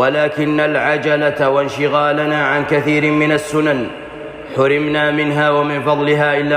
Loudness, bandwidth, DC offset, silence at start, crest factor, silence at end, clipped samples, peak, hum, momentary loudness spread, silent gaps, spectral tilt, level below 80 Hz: -15 LUFS; 15 kHz; under 0.1%; 0 s; 12 dB; 0 s; under 0.1%; -4 dBFS; none; 4 LU; none; -6 dB/octave; -52 dBFS